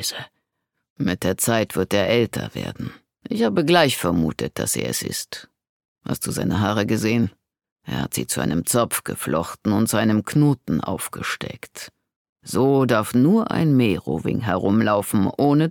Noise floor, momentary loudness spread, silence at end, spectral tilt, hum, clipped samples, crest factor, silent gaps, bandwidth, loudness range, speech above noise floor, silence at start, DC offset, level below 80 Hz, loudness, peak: -78 dBFS; 13 LU; 0 s; -5 dB/octave; none; under 0.1%; 20 dB; 0.90-0.96 s, 5.69-5.96 s, 7.72-7.76 s, 12.16-12.36 s; 19 kHz; 4 LU; 57 dB; 0 s; under 0.1%; -50 dBFS; -21 LUFS; -2 dBFS